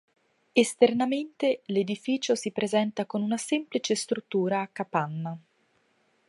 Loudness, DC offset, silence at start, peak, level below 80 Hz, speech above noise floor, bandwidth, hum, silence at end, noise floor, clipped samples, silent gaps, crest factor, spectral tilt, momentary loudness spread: -27 LUFS; under 0.1%; 0.55 s; -6 dBFS; -76 dBFS; 42 dB; 11.5 kHz; none; 0.9 s; -69 dBFS; under 0.1%; none; 22 dB; -4.5 dB/octave; 7 LU